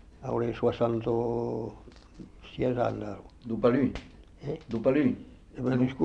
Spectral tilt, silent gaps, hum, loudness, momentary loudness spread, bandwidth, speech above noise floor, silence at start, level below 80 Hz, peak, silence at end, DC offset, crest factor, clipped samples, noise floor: -8.5 dB/octave; none; none; -29 LUFS; 18 LU; 7.8 kHz; 20 dB; 0.2 s; -52 dBFS; -10 dBFS; 0 s; under 0.1%; 20 dB; under 0.1%; -48 dBFS